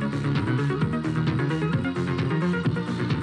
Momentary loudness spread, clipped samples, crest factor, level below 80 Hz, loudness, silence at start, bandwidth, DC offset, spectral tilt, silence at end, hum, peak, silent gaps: 2 LU; under 0.1%; 12 dB; -48 dBFS; -25 LUFS; 0 s; 10 kHz; under 0.1%; -8 dB/octave; 0 s; none; -12 dBFS; none